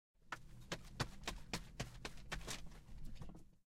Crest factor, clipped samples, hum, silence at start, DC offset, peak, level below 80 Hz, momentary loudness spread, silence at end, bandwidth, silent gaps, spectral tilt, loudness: 24 dB; under 0.1%; none; 0.15 s; under 0.1%; -24 dBFS; -56 dBFS; 13 LU; 0.15 s; 16 kHz; none; -3.5 dB/octave; -50 LUFS